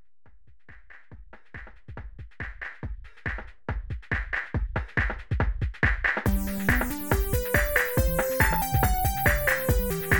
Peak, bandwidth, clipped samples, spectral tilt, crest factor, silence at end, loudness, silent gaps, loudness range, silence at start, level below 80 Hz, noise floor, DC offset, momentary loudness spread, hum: -6 dBFS; 19.5 kHz; under 0.1%; -5 dB/octave; 20 dB; 0 s; -27 LUFS; none; 15 LU; 0 s; -32 dBFS; -55 dBFS; under 0.1%; 18 LU; none